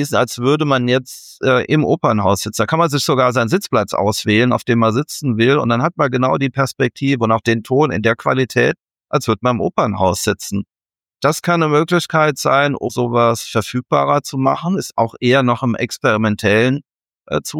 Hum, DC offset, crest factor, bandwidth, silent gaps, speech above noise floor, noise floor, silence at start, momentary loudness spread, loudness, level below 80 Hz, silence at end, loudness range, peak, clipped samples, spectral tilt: none; under 0.1%; 14 dB; 17.5 kHz; none; 64 dB; -80 dBFS; 0 s; 6 LU; -16 LUFS; -52 dBFS; 0 s; 2 LU; -2 dBFS; under 0.1%; -5.5 dB/octave